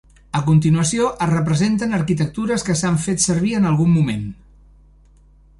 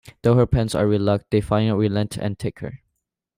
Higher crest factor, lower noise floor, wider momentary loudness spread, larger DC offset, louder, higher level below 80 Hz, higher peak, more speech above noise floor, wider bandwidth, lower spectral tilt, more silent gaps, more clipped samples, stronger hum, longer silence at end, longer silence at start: about the same, 16 dB vs 14 dB; second, -49 dBFS vs -77 dBFS; second, 6 LU vs 11 LU; neither; first, -18 LUFS vs -21 LUFS; about the same, -44 dBFS vs -40 dBFS; first, -2 dBFS vs -6 dBFS; second, 32 dB vs 57 dB; second, 11.5 kHz vs 15.5 kHz; second, -5.5 dB/octave vs -7.5 dB/octave; neither; neither; first, 50 Hz at -35 dBFS vs none; first, 1.25 s vs 0.6 s; about the same, 0.35 s vs 0.25 s